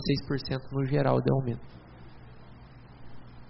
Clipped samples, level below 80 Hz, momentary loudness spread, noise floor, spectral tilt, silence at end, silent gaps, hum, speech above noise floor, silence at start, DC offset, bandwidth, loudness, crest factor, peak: under 0.1%; -52 dBFS; 26 LU; -49 dBFS; -6.5 dB/octave; 0 s; none; 60 Hz at -50 dBFS; 21 dB; 0 s; under 0.1%; 5.8 kHz; -29 LUFS; 20 dB; -10 dBFS